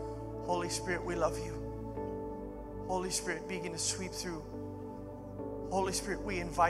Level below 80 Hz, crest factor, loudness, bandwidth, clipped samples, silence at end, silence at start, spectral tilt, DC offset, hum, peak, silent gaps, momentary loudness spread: -50 dBFS; 22 dB; -37 LUFS; 15.5 kHz; under 0.1%; 0 s; 0 s; -4 dB/octave; under 0.1%; none; -16 dBFS; none; 10 LU